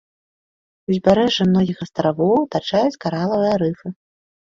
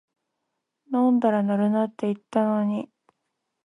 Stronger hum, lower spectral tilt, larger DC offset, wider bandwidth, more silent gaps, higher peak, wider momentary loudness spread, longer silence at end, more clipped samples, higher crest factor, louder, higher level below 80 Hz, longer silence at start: neither; second, -7 dB/octave vs -9 dB/octave; neither; second, 7.4 kHz vs 10 kHz; neither; first, -2 dBFS vs -8 dBFS; about the same, 8 LU vs 9 LU; second, 0.5 s vs 0.8 s; neither; about the same, 18 dB vs 16 dB; first, -19 LUFS vs -24 LUFS; first, -52 dBFS vs -76 dBFS; about the same, 0.9 s vs 0.9 s